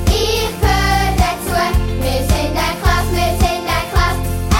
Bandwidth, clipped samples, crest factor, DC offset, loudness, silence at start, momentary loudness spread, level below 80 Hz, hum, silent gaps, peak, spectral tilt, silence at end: 17 kHz; under 0.1%; 14 dB; under 0.1%; -16 LUFS; 0 s; 3 LU; -20 dBFS; none; none; 0 dBFS; -4.5 dB/octave; 0 s